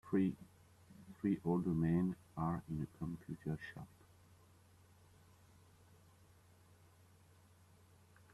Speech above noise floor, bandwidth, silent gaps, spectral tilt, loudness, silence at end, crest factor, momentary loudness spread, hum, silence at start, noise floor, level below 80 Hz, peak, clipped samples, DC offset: 28 dB; 13 kHz; none; -9 dB/octave; -40 LUFS; 4.45 s; 20 dB; 23 LU; none; 0.05 s; -66 dBFS; -68 dBFS; -24 dBFS; under 0.1%; under 0.1%